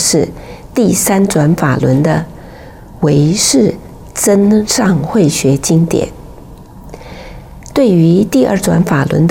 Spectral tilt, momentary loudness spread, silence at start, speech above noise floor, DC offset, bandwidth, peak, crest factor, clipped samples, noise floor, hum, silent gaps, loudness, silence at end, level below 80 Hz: -5 dB/octave; 20 LU; 0 s; 22 dB; under 0.1%; 17 kHz; 0 dBFS; 12 dB; under 0.1%; -33 dBFS; none; none; -11 LUFS; 0 s; -36 dBFS